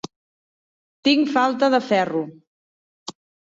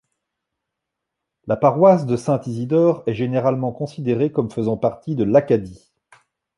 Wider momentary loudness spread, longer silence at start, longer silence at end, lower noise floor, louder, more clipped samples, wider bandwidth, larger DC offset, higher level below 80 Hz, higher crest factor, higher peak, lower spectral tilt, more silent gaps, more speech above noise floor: first, 20 LU vs 10 LU; second, 1.05 s vs 1.45 s; second, 0.4 s vs 0.8 s; first, under -90 dBFS vs -81 dBFS; about the same, -20 LUFS vs -19 LUFS; neither; second, 7.8 kHz vs 11.5 kHz; neither; second, -70 dBFS vs -56 dBFS; about the same, 18 dB vs 18 dB; second, -6 dBFS vs -2 dBFS; second, -4.5 dB/octave vs -8.5 dB/octave; first, 2.47-3.06 s vs none; first, over 71 dB vs 63 dB